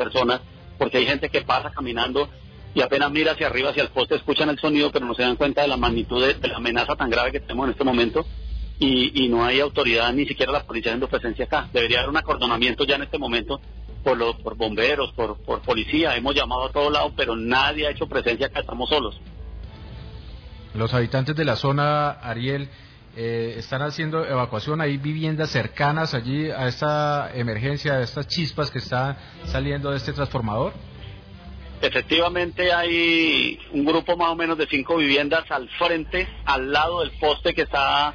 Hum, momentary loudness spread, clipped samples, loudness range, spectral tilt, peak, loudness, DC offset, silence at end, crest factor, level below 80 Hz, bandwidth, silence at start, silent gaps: none; 9 LU; under 0.1%; 5 LU; -6 dB/octave; -8 dBFS; -22 LUFS; under 0.1%; 0 s; 16 dB; -40 dBFS; 5.4 kHz; 0 s; none